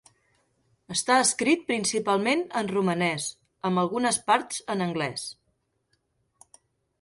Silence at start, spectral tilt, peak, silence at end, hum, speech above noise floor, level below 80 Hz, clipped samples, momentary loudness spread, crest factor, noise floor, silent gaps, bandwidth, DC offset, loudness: 0.9 s; -3.5 dB/octave; -8 dBFS; 1.7 s; none; 48 dB; -68 dBFS; under 0.1%; 10 LU; 20 dB; -74 dBFS; none; 11.5 kHz; under 0.1%; -25 LUFS